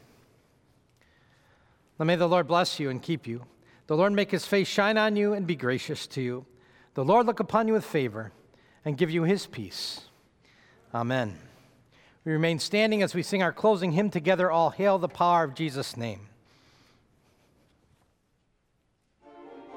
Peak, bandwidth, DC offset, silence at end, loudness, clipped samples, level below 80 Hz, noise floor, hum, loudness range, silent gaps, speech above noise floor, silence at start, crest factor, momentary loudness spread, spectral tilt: -8 dBFS; 18 kHz; under 0.1%; 0 s; -27 LUFS; under 0.1%; -70 dBFS; -72 dBFS; none; 7 LU; none; 46 dB; 2 s; 20 dB; 13 LU; -5.5 dB/octave